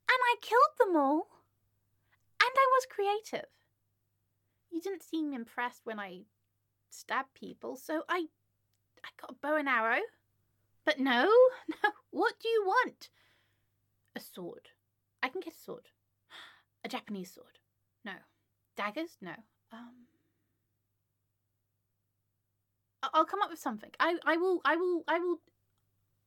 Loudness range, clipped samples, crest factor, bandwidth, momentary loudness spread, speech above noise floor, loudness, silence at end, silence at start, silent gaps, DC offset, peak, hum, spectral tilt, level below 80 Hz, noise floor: 15 LU; under 0.1%; 26 dB; 17 kHz; 22 LU; 50 dB; -31 LUFS; 0.9 s; 0.1 s; none; under 0.1%; -8 dBFS; none; -3.5 dB/octave; -86 dBFS; -82 dBFS